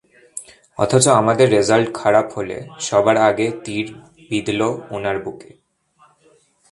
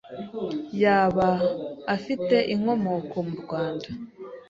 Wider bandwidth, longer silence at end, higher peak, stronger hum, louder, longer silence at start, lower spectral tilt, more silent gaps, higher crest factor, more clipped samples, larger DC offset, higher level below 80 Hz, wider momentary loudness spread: first, 11.5 kHz vs 7.6 kHz; first, 1.3 s vs 0.1 s; first, 0 dBFS vs -8 dBFS; neither; first, -17 LUFS vs -25 LUFS; first, 0.35 s vs 0.05 s; second, -4.5 dB/octave vs -7.5 dB/octave; neither; about the same, 18 dB vs 16 dB; neither; neither; about the same, -54 dBFS vs -58 dBFS; first, 19 LU vs 14 LU